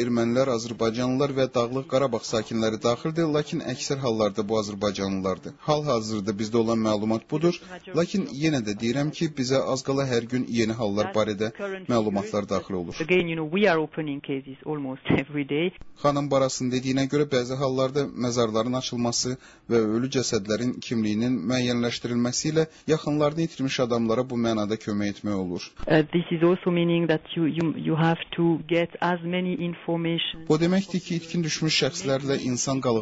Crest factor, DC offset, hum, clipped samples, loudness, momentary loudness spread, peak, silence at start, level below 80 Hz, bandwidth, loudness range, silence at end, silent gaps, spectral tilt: 16 dB; under 0.1%; none; under 0.1%; -25 LUFS; 6 LU; -8 dBFS; 0 s; -56 dBFS; 8 kHz; 2 LU; 0 s; none; -5.5 dB/octave